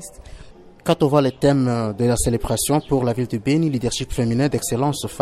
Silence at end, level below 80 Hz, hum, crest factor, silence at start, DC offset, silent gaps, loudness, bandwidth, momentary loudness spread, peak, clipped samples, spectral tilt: 0 s; -38 dBFS; none; 16 dB; 0 s; under 0.1%; none; -20 LUFS; 15 kHz; 6 LU; -4 dBFS; under 0.1%; -5.5 dB/octave